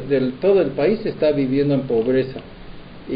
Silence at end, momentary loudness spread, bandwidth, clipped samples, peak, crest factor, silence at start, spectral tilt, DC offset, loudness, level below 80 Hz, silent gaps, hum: 0 s; 9 LU; 5.2 kHz; under 0.1%; -6 dBFS; 14 dB; 0 s; -11 dB/octave; under 0.1%; -19 LUFS; -44 dBFS; none; none